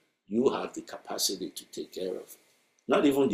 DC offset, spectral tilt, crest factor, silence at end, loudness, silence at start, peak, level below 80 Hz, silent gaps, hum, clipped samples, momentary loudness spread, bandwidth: under 0.1%; -3.5 dB/octave; 18 dB; 0 s; -30 LUFS; 0.3 s; -12 dBFS; -70 dBFS; none; none; under 0.1%; 16 LU; 15.5 kHz